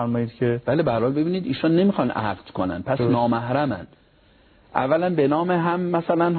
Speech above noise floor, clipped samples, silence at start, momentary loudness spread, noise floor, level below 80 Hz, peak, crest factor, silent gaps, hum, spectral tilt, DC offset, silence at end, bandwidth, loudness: 34 dB; under 0.1%; 0 s; 7 LU; -56 dBFS; -54 dBFS; -2 dBFS; 20 dB; none; none; -11.5 dB/octave; under 0.1%; 0 s; 4.5 kHz; -22 LUFS